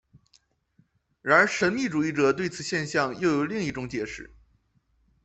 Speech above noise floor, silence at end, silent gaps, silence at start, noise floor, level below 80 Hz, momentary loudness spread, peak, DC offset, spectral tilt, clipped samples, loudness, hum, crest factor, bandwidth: 43 dB; 1 s; none; 1.25 s; -68 dBFS; -60 dBFS; 13 LU; -6 dBFS; under 0.1%; -5 dB/octave; under 0.1%; -25 LUFS; none; 22 dB; 8.4 kHz